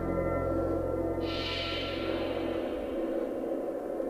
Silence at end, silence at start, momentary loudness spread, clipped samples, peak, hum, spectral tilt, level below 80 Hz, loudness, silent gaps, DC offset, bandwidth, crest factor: 0 s; 0 s; 3 LU; under 0.1%; -20 dBFS; none; -6.5 dB/octave; -46 dBFS; -32 LUFS; none; under 0.1%; 15.5 kHz; 12 dB